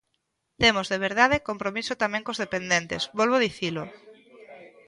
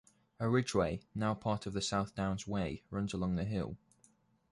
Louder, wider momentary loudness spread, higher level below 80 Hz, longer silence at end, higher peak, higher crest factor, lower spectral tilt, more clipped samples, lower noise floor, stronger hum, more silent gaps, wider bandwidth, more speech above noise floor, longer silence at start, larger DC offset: first, -24 LUFS vs -36 LUFS; about the same, 9 LU vs 7 LU; about the same, -54 dBFS vs -56 dBFS; second, 0.2 s vs 0.75 s; first, -4 dBFS vs -18 dBFS; about the same, 22 dB vs 18 dB; second, -3.5 dB/octave vs -6 dB/octave; neither; first, -77 dBFS vs -70 dBFS; neither; neither; about the same, 11.5 kHz vs 11.5 kHz; first, 52 dB vs 35 dB; first, 0.6 s vs 0.4 s; neither